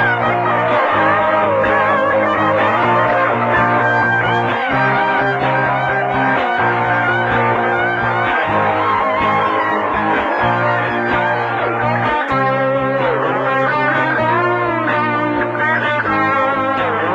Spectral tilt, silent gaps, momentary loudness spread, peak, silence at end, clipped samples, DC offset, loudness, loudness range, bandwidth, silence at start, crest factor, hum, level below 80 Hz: -7 dB/octave; none; 3 LU; -2 dBFS; 0 s; under 0.1%; under 0.1%; -15 LUFS; 2 LU; 11 kHz; 0 s; 14 dB; none; -46 dBFS